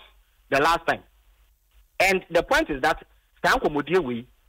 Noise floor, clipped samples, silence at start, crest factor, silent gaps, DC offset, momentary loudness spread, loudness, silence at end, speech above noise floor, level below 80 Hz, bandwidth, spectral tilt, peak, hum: -60 dBFS; under 0.1%; 0.5 s; 14 dB; none; under 0.1%; 10 LU; -23 LUFS; 0.25 s; 37 dB; -46 dBFS; 16 kHz; -4 dB/octave; -10 dBFS; none